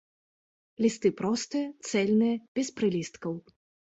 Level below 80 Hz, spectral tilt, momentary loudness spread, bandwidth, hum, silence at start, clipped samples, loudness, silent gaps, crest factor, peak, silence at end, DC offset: -70 dBFS; -5 dB/octave; 11 LU; 8.2 kHz; none; 0.8 s; under 0.1%; -29 LUFS; 2.48-2.55 s; 18 dB; -12 dBFS; 0.55 s; under 0.1%